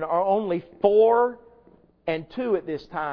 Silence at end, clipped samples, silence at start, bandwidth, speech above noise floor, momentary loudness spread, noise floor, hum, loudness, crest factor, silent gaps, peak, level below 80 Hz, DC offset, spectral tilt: 0 s; under 0.1%; 0 s; 5.4 kHz; 34 dB; 12 LU; -56 dBFS; none; -23 LUFS; 18 dB; none; -6 dBFS; -60 dBFS; under 0.1%; -8.5 dB/octave